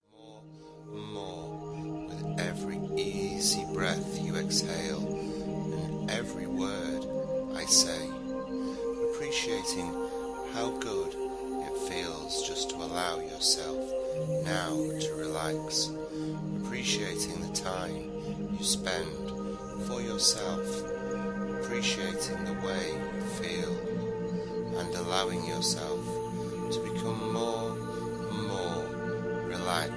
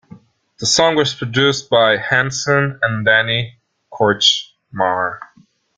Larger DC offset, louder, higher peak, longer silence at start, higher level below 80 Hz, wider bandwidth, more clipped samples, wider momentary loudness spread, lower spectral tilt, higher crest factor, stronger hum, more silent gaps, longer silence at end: neither; second, -32 LUFS vs -15 LUFS; second, -10 dBFS vs 0 dBFS; second, 0.15 s vs 0.6 s; about the same, -54 dBFS vs -56 dBFS; first, 11 kHz vs 9.6 kHz; neither; about the same, 8 LU vs 8 LU; about the same, -3.5 dB/octave vs -3 dB/octave; about the same, 22 dB vs 18 dB; neither; neither; second, 0 s vs 0.55 s